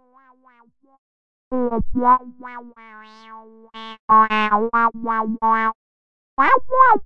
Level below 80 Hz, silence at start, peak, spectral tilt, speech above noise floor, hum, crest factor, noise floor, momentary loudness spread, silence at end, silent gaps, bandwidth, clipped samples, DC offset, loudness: -42 dBFS; 0 s; -2 dBFS; -7 dB/octave; 35 dB; none; 18 dB; -54 dBFS; 22 LU; 0 s; 0.99-1.51 s, 3.99-4.08 s, 5.75-6.37 s; 6.4 kHz; under 0.1%; under 0.1%; -18 LUFS